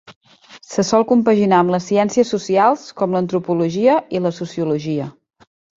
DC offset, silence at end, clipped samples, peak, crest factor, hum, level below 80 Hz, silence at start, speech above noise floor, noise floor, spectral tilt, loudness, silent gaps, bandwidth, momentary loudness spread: under 0.1%; 0.7 s; under 0.1%; -2 dBFS; 16 dB; none; -60 dBFS; 0.1 s; 28 dB; -44 dBFS; -6 dB/octave; -17 LUFS; 0.16-0.21 s; 7.8 kHz; 9 LU